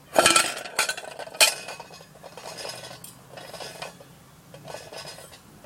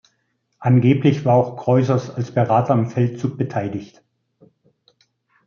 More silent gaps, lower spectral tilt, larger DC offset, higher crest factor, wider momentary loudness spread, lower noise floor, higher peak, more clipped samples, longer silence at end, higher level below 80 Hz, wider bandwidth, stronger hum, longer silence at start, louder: neither; second, -0.5 dB/octave vs -9 dB/octave; neither; first, 28 dB vs 18 dB; first, 25 LU vs 9 LU; second, -50 dBFS vs -69 dBFS; about the same, 0 dBFS vs -2 dBFS; neither; second, 0.3 s vs 1.6 s; about the same, -64 dBFS vs -62 dBFS; first, 16.5 kHz vs 6.8 kHz; neither; second, 0.1 s vs 0.6 s; second, -22 LUFS vs -19 LUFS